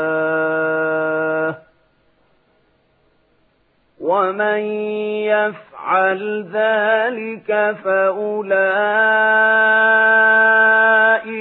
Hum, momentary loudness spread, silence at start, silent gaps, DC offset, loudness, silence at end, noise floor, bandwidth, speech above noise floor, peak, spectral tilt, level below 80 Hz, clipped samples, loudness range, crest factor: none; 11 LU; 0 s; none; under 0.1%; -15 LUFS; 0 s; -61 dBFS; 4.1 kHz; 45 dB; -2 dBFS; -9.5 dB/octave; -72 dBFS; under 0.1%; 12 LU; 14 dB